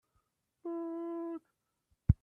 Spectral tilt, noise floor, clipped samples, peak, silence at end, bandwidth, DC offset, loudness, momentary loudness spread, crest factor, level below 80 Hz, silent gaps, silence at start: -12.5 dB/octave; -81 dBFS; under 0.1%; -10 dBFS; 0.1 s; 3.2 kHz; under 0.1%; -40 LUFS; 11 LU; 26 dB; -46 dBFS; none; 0.65 s